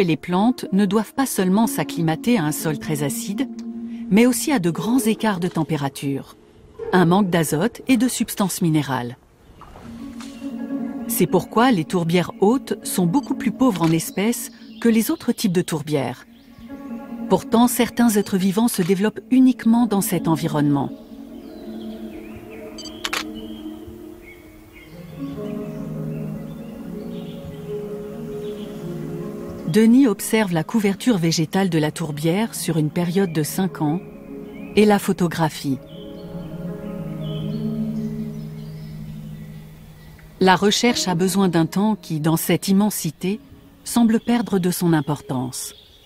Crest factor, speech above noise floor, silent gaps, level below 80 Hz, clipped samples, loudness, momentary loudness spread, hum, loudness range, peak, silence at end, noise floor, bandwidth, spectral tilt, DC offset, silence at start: 20 dB; 27 dB; none; -52 dBFS; under 0.1%; -21 LUFS; 18 LU; none; 12 LU; 0 dBFS; 0.3 s; -45 dBFS; 16 kHz; -5.5 dB/octave; under 0.1%; 0 s